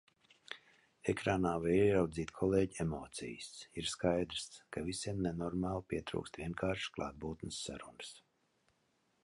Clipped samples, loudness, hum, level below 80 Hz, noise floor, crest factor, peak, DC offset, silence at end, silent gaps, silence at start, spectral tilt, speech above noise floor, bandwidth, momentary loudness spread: under 0.1%; -37 LUFS; none; -58 dBFS; -78 dBFS; 20 dB; -18 dBFS; under 0.1%; 1.05 s; none; 0.5 s; -5.5 dB/octave; 41 dB; 11.5 kHz; 15 LU